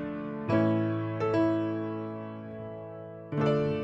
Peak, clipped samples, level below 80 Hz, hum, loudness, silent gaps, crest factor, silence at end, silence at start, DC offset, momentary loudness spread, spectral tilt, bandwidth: -14 dBFS; under 0.1%; -62 dBFS; none; -30 LUFS; none; 16 dB; 0 s; 0 s; under 0.1%; 14 LU; -9 dB/octave; 7.6 kHz